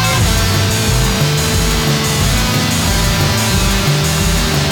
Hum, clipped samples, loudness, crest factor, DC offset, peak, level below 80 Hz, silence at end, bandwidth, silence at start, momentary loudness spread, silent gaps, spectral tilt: none; under 0.1%; -13 LUFS; 10 dB; under 0.1%; -2 dBFS; -20 dBFS; 0 s; over 20 kHz; 0 s; 1 LU; none; -4 dB/octave